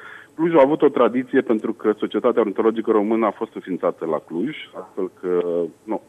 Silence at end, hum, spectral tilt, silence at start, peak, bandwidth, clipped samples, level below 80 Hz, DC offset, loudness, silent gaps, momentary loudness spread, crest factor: 0.1 s; none; -8 dB/octave; 0 s; -2 dBFS; 8.4 kHz; under 0.1%; -68 dBFS; under 0.1%; -21 LUFS; none; 12 LU; 18 dB